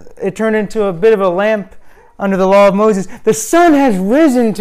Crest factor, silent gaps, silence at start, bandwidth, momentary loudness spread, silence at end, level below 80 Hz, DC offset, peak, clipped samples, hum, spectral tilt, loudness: 10 dB; none; 0 s; 16 kHz; 9 LU; 0 s; -42 dBFS; under 0.1%; -2 dBFS; under 0.1%; none; -5.5 dB/octave; -12 LUFS